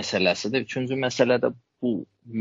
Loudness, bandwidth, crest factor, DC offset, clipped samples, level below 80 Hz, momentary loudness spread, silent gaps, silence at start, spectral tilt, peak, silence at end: -25 LUFS; 7.8 kHz; 18 dB; under 0.1%; under 0.1%; -68 dBFS; 9 LU; none; 0 s; -3.5 dB/octave; -6 dBFS; 0 s